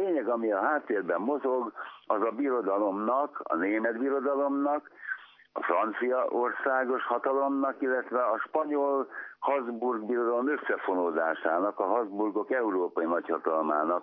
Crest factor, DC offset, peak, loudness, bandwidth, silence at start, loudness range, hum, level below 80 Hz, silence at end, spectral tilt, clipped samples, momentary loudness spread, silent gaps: 18 dB; under 0.1%; -12 dBFS; -29 LUFS; 5.4 kHz; 0 s; 1 LU; none; under -90 dBFS; 0 s; -9 dB/octave; under 0.1%; 4 LU; none